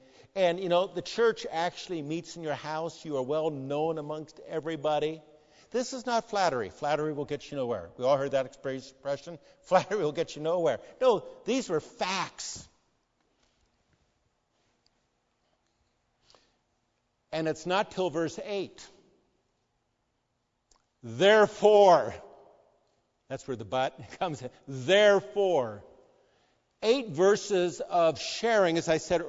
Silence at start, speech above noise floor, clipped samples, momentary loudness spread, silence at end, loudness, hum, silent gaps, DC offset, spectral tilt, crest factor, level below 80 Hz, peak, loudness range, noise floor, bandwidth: 0.35 s; 50 dB; under 0.1%; 16 LU; 0 s; -28 LUFS; none; none; under 0.1%; -4.5 dB/octave; 22 dB; -68 dBFS; -8 dBFS; 10 LU; -78 dBFS; 7.8 kHz